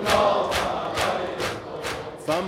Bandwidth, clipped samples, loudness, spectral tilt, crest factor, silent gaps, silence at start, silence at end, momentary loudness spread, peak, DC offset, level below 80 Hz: 17 kHz; under 0.1%; -25 LUFS; -3.5 dB/octave; 18 dB; none; 0 s; 0 s; 11 LU; -6 dBFS; under 0.1%; -48 dBFS